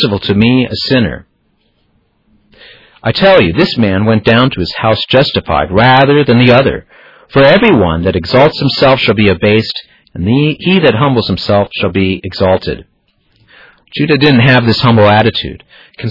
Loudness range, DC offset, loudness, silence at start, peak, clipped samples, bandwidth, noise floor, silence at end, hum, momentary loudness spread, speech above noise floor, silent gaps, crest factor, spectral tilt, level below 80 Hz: 5 LU; under 0.1%; -9 LUFS; 0 s; 0 dBFS; 0.2%; 6 kHz; -57 dBFS; 0 s; none; 11 LU; 48 dB; none; 10 dB; -8 dB/octave; -38 dBFS